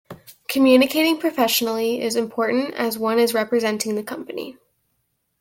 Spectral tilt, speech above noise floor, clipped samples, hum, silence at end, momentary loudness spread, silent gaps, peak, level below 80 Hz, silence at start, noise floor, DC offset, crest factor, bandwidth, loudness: -3 dB/octave; 52 dB; under 0.1%; none; 0.9 s; 15 LU; none; -4 dBFS; -66 dBFS; 0.1 s; -72 dBFS; under 0.1%; 18 dB; 17 kHz; -20 LUFS